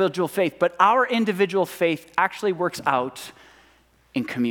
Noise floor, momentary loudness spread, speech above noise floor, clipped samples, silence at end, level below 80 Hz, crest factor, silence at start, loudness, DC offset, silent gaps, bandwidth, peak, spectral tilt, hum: -58 dBFS; 12 LU; 36 dB; under 0.1%; 0 s; -66 dBFS; 20 dB; 0 s; -22 LUFS; under 0.1%; none; 18.5 kHz; -4 dBFS; -5 dB/octave; none